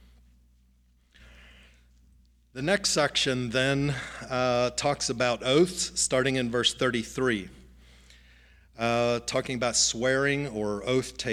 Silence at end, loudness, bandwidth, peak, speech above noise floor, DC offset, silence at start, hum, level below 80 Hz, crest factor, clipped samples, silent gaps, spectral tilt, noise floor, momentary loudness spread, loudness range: 0 s; -26 LUFS; 15.5 kHz; -10 dBFS; 36 dB; under 0.1%; 2.55 s; 60 Hz at -55 dBFS; -54 dBFS; 20 dB; under 0.1%; none; -3.5 dB/octave; -63 dBFS; 8 LU; 3 LU